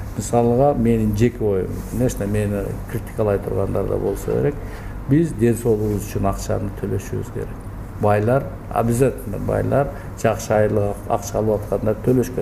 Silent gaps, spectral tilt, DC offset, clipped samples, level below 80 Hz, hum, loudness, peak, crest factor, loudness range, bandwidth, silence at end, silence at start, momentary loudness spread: none; -7.5 dB/octave; under 0.1%; under 0.1%; -34 dBFS; none; -21 LUFS; -2 dBFS; 18 dB; 2 LU; 16 kHz; 0 s; 0 s; 9 LU